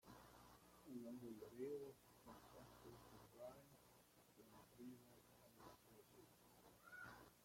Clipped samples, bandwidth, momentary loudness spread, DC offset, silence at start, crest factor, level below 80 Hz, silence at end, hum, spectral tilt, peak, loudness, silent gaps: under 0.1%; 16.5 kHz; 14 LU; under 0.1%; 0.05 s; 20 dB; -82 dBFS; 0 s; none; -5 dB/octave; -40 dBFS; -61 LUFS; none